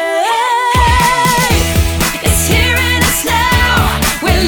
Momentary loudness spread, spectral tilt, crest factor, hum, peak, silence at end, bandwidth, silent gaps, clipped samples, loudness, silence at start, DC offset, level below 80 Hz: 3 LU; -3.5 dB/octave; 12 dB; none; 0 dBFS; 0 s; over 20 kHz; none; under 0.1%; -11 LUFS; 0 s; under 0.1%; -20 dBFS